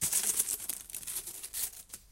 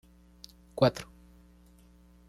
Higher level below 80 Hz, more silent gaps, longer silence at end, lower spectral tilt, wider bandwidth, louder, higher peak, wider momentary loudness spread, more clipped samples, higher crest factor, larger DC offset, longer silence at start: about the same, -62 dBFS vs -58 dBFS; neither; second, 0 s vs 1.25 s; second, 0.5 dB/octave vs -6.5 dB/octave; first, 17 kHz vs 14 kHz; second, -33 LUFS vs -28 LUFS; about the same, -12 dBFS vs -10 dBFS; second, 11 LU vs 25 LU; neither; about the same, 24 dB vs 24 dB; neither; second, 0 s vs 0.75 s